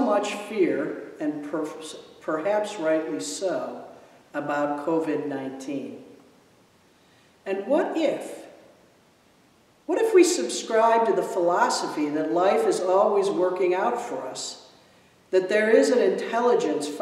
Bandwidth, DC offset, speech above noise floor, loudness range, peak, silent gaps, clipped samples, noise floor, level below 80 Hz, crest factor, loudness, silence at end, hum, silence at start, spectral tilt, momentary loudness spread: 14 kHz; under 0.1%; 35 dB; 8 LU; -6 dBFS; none; under 0.1%; -59 dBFS; -78 dBFS; 18 dB; -24 LUFS; 0 s; none; 0 s; -4 dB/octave; 15 LU